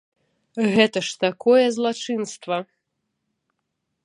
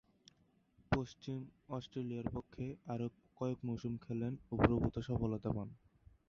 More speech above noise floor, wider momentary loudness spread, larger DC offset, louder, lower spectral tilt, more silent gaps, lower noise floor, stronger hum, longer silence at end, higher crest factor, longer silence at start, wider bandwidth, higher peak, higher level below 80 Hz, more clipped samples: first, 57 dB vs 33 dB; about the same, 11 LU vs 12 LU; neither; first, -21 LUFS vs -40 LUFS; second, -4.5 dB/octave vs -7.5 dB/octave; neither; first, -78 dBFS vs -73 dBFS; neither; first, 1.4 s vs 0.55 s; second, 22 dB vs 28 dB; second, 0.55 s vs 0.9 s; first, 11 kHz vs 7 kHz; first, -2 dBFS vs -12 dBFS; second, -68 dBFS vs -54 dBFS; neither